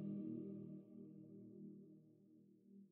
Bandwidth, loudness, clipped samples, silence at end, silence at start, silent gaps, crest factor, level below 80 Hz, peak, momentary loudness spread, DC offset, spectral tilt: 3 kHz; -54 LUFS; under 0.1%; 0 s; 0 s; none; 16 dB; under -90 dBFS; -38 dBFS; 21 LU; under 0.1%; -14 dB/octave